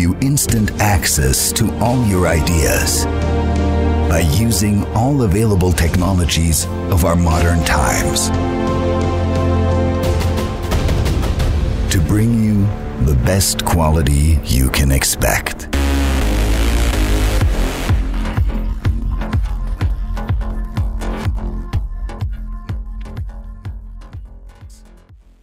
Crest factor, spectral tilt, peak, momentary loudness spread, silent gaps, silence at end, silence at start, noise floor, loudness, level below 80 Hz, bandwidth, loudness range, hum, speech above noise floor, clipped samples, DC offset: 16 dB; -5 dB/octave; 0 dBFS; 11 LU; none; 0.25 s; 0 s; -43 dBFS; -16 LUFS; -20 dBFS; 16.5 kHz; 9 LU; none; 29 dB; under 0.1%; under 0.1%